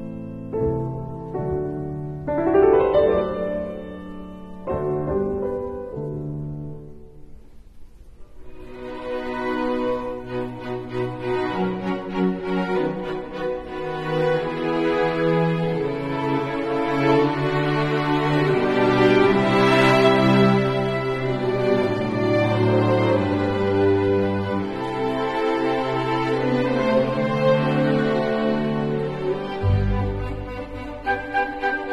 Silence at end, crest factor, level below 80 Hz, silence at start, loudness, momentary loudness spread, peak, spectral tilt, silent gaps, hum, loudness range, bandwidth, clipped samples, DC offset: 0 s; 18 dB; -42 dBFS; 0 s; -22 LUFS; 13 LU; -2 dBFS; -7.5 dB/octave; none; none; 11 LU; 12 kHz; under 0.1%; under 0.1%